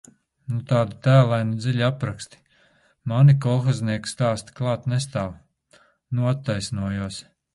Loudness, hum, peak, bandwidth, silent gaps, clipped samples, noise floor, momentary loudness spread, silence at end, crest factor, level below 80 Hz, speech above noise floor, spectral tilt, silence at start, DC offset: -23 LUFS; none; -4 dBFS; 11.5 kHz; none; under 0.1%; -60 dBFS; 16 LU; 0.35 s; 20 dB; -52 dBFS; 39 dB; -7 dB/octave; 0.5 s; under 0.1%